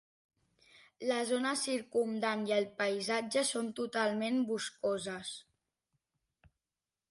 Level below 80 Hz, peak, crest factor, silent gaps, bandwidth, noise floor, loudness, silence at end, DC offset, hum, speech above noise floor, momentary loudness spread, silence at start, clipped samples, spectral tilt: -80 dBFS; -18 dBFS; 18 dB; none; 11.5 kHz; under -90 dBFS; -34 LUFS; 1.7 s; under 0.1%; none; over 56 dB; 6 LU; 0.75 s; under 0.1%; -3 dB/octave